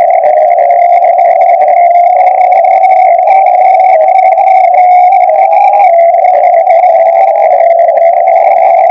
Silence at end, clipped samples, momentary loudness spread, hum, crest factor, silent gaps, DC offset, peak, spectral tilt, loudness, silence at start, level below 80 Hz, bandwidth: 0 s; 7%; 1 LU; none; 4 dB; none; under 0.1%; 0 dBFS; -3 dB/octave; -5 LUFS; 0 s; -72 dBFS; 5.4 kHz